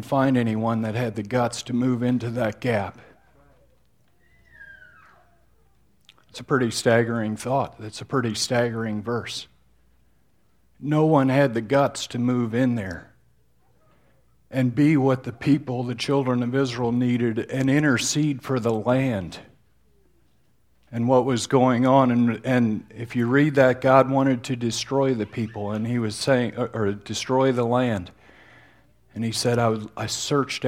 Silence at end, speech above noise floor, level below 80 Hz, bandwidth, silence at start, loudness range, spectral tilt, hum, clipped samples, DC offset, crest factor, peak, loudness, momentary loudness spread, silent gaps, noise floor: 0 s; 43 dB; -60 dBFS; 15.5 kHz; 0 s; 7 LU; -5.5 dB/octave; none; under 0.1%; under 0.1%; 22 dB; -2 dBFS; -23 LUFS; 11 LU; none; -65 dBFS